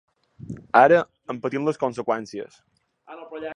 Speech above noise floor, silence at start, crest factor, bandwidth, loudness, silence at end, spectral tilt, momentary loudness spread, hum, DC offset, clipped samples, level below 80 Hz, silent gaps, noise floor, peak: 25 dB; 0.45 s; 22 dB; 10.5 kHz; -21 LUFS; 0 s; -6.5 dB/octave; 23 LU; none; under 0.1%; under 0.1%; -64 dBFS; none; -46 dBFS; -2 dBFS